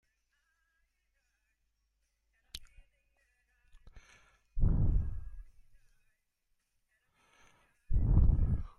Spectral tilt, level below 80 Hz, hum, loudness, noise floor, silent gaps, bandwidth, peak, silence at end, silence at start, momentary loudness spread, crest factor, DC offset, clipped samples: -8.5 dB/octave; -38 dBFS; none; -33 LUFS; -80 dBFS; none; 6.8 kHz; -14 dBFS; 0.1 s; 2.55 s; 21 LU; 20 dB; under 0.1%; under 0.1%